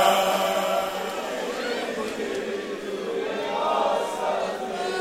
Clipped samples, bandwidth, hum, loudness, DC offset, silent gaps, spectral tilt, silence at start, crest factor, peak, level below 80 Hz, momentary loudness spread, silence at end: under 0.1%; 16 kHz; none; -26 LUFS; under 0.1%; none; -3 dB/octave; 0 s; 20 dB; -6 dBFS; -62 dBFS; 7 LU; 0 s